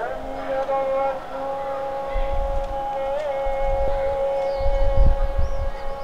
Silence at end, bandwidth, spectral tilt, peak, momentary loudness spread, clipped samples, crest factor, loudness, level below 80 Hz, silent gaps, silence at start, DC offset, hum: 0 s; 6.8 kHz; -7 dB/octave; -6 dBFS; 7 LU; under 0.1%; 16 dB; -25 LUFS; -24 dBFS; none; 0 s; 1%; none